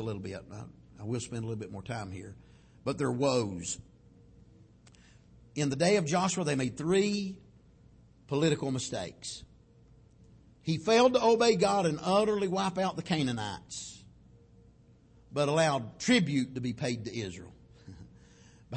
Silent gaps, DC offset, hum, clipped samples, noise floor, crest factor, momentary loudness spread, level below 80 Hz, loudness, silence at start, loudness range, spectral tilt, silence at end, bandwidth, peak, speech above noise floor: none; under 0.1%; none; under 0.1%; -60 dBFS; 20 dB; 18 LU; -62 dBFS; -30 LUFS; 0 s; 8 LU; -5 dB/octave; 0 s; 8.8 kHz; -12 dBFS; 30 dB